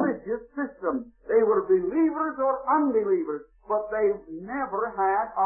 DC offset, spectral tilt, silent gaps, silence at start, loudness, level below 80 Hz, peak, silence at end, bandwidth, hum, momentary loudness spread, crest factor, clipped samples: under 0.1%; -13.5 dB/octave; none; 0 s; -26 LUFS; -60 dBFS; -12 dBFS; 0 s; 2.8 kHz; none; 11 LU; 14 dB; under 0.1%